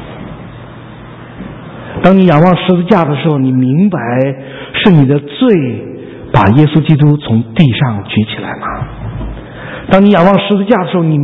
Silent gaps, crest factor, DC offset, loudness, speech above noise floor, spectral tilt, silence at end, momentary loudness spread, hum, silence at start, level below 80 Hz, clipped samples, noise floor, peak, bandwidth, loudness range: none; 10 dB; under 0.1%; -10 LUFS; 21 dB; -9.5 dB/octave; 0 s; 21 LU; none; 0 s; -34 dBFS; 0.8%; -30 dBFS; 0 dBFS; 5 kHz; 2 LU